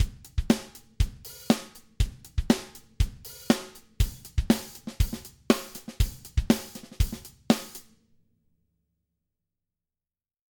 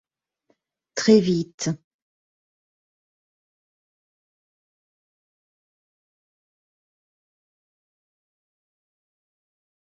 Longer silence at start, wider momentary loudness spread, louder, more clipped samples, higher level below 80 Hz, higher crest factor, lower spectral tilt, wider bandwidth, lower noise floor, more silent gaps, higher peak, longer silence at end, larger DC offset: second, 0 s vs 0.95 s; about the same, 16 LU vs 15 LU; second, -29 LUFS vs -21 LUFS; neither; first, -34 dBFS vs -68 dBFS; about the same, 26 dB vs 26 dB; about the same, -5.5 dB/octave vs -6 dB/octave; first, 19 kHz vs 7.4 kHz; first, under -90 dBFS vs -70 dBFS; second, none vs 1.54-1.58 s; about the same, -4 dBFS vs -4 dBFS; second, 2.7 s vs 8.05 s; neither